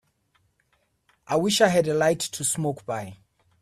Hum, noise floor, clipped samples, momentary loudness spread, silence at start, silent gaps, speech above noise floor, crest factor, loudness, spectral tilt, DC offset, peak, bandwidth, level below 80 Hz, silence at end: none; -69 dBFS; under 0.1%; 13 LU; 1.3 s; none; 46 dB; 22 dB; -24 LUFS; -3.5 dB/octave; under 0.1%; -4 dBFS; 15.5 kHz; -64 dBFS; 0.45 s